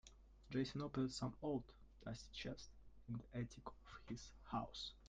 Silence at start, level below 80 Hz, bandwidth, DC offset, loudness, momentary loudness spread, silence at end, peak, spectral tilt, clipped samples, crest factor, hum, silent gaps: 0.05 s; -64 dBFS; 9.4 kHz; under 0.1%; -49 LUFS; 15 LU; 0 s; -30 dBFS; -5.5 dB/octave; under 0.1%; 18 dB; none; none